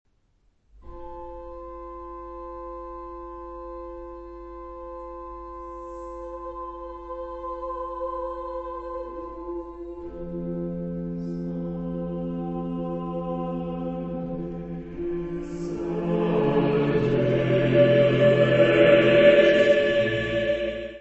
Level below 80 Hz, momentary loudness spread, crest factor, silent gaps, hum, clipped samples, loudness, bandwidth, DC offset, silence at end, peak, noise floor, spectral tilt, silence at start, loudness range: -46 dBFS; 21 LU; 22 dB; none; none; under 0.1%; -24 LUFS; 8 kHz; under 0.1%; 0 s; -4 dBFS; -65 dBFS; -7.5 dB/octave; 0.75 s; 20 LU